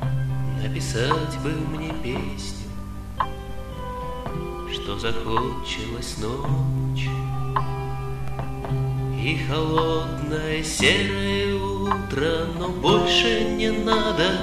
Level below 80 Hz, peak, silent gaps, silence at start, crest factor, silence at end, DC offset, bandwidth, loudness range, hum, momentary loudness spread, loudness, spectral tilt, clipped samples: -36 dBFS; -6 dBFS; none; 0 s; 18 dB; 0 s; under 0.1%; 14 kHz; 8 LU; 50 Hz at -40 dBFS; 12 LU; -24 LUFS; -5 dB/octave; under 0.1%